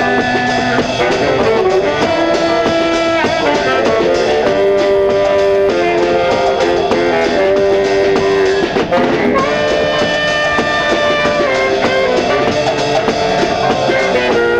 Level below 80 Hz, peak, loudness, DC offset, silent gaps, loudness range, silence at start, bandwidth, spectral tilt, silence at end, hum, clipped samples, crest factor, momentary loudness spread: -38 dBFS; -4 dBFS; -12 LUFS; under 0.1%; none; 1 LU; 0 s; 10.5 kHz; -4.5 dB/octave; 0 s; none; under 0.1%; 8 dB; 2 LU